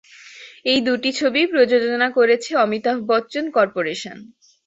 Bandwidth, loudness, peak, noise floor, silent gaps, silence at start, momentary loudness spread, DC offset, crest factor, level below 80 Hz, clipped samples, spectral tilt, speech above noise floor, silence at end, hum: 8 kHz; -19 LUFS; -4 dBFS; -42 dBFS; none; 0.25 s; 10 LU; under 0.1%; 16 dB; -66 dBFS; under 0.1%; -3.5 dB/octave; 24 dB; 0.4 s; none